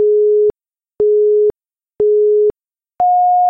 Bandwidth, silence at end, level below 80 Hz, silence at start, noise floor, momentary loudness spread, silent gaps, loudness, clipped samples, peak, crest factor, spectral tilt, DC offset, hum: 1.5 kHz; 0 s; -52 dBFS; 0 s; -70 dBFS; 6 LU; none; -14 LUFS; under 0.1%; -8 dBFS; 6 dB; -10.5 dB/octave; under 0.1%; none